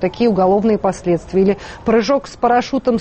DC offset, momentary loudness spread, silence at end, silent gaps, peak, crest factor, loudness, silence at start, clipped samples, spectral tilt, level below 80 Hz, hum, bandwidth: under 0.1%; 4 LU; 0 s; none; -4 dBFS; 12 dB; -16 LUFS; 0 s; under 0.1%; -6.5 dB/octave; -42 dBFS; none; 8.8 kHz